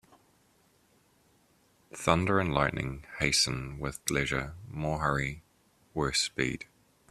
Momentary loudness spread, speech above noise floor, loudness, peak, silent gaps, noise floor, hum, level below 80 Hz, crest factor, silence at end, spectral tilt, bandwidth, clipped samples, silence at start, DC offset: 14 LU; 36 dB; -30 LUFS; -6 dBFS; none; -67 dBFS; none; -50 dBFS; 26 dB; 0.45 s; -3.5 dB/octave; 14 kHz; under 0.1%; 1.95 s; under 0.1%